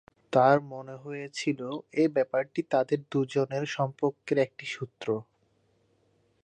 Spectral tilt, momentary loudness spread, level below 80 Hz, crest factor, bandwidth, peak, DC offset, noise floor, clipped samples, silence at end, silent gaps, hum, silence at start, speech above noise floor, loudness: -6 dB/octave; 13 LU; -78 dBFS; 22 dB; 9.6 kHz; -8 dBFS; under 0.1%; -69 dBFS; under 0.1%; 1.2 s; none; none; 0.3 s; 41 dB; -29 LUFS